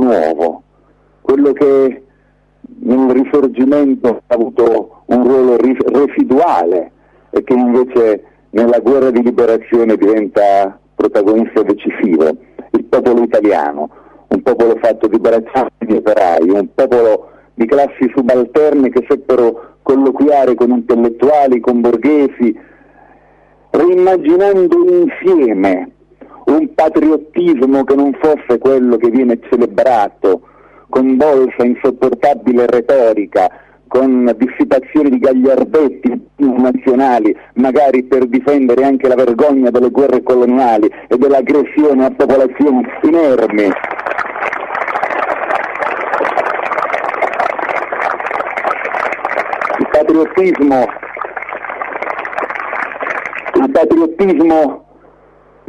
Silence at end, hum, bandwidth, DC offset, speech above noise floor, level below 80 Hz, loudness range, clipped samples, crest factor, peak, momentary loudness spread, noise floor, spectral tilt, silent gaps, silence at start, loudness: 0.9 s; 50 Hz at -55 dBFS; 8.6 kHz; under 0.1%; 41 dB; -50 dBFS; 4 LU; under 0.1%; 10 dB; -2 dBFS; 8 LU; -52 dBFS; -7.5 dB/octave; none; 0 s; -12 LUFS